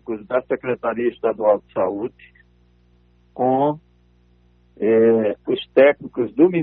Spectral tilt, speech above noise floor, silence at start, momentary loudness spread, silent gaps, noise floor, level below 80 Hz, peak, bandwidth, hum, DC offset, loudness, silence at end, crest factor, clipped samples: -10.5 dB/octave; 37 dB; 0.1 s; 10 LU; none; -56 dBFS; -58 dBFS; -2 dBFS; 4.2 kHz; 60 Hz at -55 dBFS; under 0.1%; -19 LUFS; 0 s; 18 dB; under 0.1%